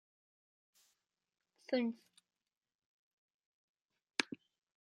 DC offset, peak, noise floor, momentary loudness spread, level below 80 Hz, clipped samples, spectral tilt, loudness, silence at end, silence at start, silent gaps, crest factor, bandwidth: under 0.1%; -12 dBFS; -84 dBFS; 17 LU; under -90 dBFS; under 0.1%; -3 dB/octave; -40 LUFS; 0.45 s; 1.7 s; 2.57-2.61 s, 2.75-2.79 s, 2.86-3.39 s, 3.46-3.75 s, 3.85-3.89 s; 36 dB; 11.5 kHz